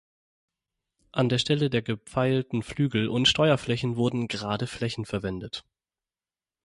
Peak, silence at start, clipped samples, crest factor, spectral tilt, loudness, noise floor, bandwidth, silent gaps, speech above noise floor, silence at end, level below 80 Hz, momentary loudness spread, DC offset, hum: -10 dBFS; 1.15 s; under 0.1%; 18 dB; -5.5 dB/octave; -26 LUFS; under -90 dBFS; 11.5 kHz; none; over 64 dB; 1.05 s; -54 dBFS; 10 LU; under 0.1%; none